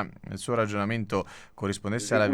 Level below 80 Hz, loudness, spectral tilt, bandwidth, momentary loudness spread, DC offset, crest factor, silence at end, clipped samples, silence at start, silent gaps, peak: -58 dBFS; -29 LUFS; -5.5 dB/octave; 14.5 kHz; 9 LU; under 0.1%; 18 dB; 0 s; under 0.1%; 0 s; none; -12 dBFS